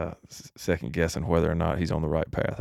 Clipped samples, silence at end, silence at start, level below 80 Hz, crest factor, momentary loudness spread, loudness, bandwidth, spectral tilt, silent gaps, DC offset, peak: under 0.1%; 0 s; 0 s; -40 dBFS; 18 dB; 11 LU; -28 LUFS; 14.5 kHz; -6.5 dB/octave; none; under 0.1%; -10 dBFS